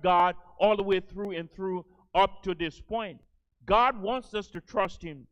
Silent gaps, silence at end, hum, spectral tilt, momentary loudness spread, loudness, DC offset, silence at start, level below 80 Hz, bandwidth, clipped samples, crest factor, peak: none; 0.1 s; none; -6 dB/octave; 12 LU; -29 LUFS; under 0.1%; 0.05 s; -50 dBFS; 9.2 kHz; under 0.1%; 20 dB; -10 dBFS